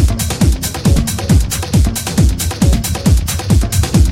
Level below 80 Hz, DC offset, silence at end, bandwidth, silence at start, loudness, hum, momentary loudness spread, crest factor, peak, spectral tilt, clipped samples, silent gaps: -16 dBFS; under 0.1%; 0 s; 16.5 kHz; 0 s; -14 LUFS; none; 2 LU; 12 dB; 0 dBFS; -5 dB/octave; under 0.1%; none